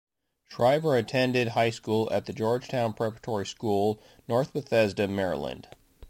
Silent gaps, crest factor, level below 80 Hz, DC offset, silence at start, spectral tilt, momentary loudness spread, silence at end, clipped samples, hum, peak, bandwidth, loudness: none; 16 dB; -60 dBFS; under 0.1%; 0.5 s; -6 dB/octave; 8 LU; 0 s; under 0.1%; none; -12 dBFS; 16.5 kHz; -27 LUFS